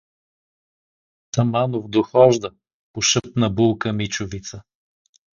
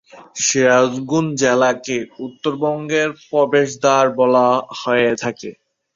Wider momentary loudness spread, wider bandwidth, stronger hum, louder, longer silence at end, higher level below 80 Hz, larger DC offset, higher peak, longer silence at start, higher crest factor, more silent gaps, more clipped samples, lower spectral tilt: first, 17 LU vs 11 LU; about the same, 7.4 kHz vs 7.8 kHz; neither; second, -20 LUFS vs -17 LUFS; first, 0.75 s vs 0.45 s; first, -50 dBFS vs -60 dBFS; neither; about the same, 0 dBFS vs -2 dBFS; first, 1.35 s vs 0.15 s; first, 22 dB vs 16 dB; first, 2.73-2.94 s vs none; neither; about the same, -4.5 dB/octave vs -4 dB/octave